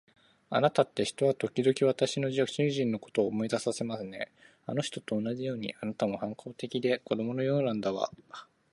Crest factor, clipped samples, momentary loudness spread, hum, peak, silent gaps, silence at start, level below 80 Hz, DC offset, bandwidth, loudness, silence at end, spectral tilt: 20 dB; under 0.1%; 11 LU; none; -10 dBFS; none; 0.5 s; -72 dBFS; under 0.1%; 11.5 kHz; -31 LUFS; 0.3 s; -5.5 dB/octave